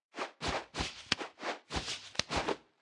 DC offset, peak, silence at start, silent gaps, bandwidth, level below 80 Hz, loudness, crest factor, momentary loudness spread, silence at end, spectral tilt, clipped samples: under 0.1%; -8 dBFS; 0.15 s; none; 12 kHz; -54 dBFS; -37 LUFS; 30 dB; 5 LU; 0.2 s; -2.5 dB/octave; under 0.1%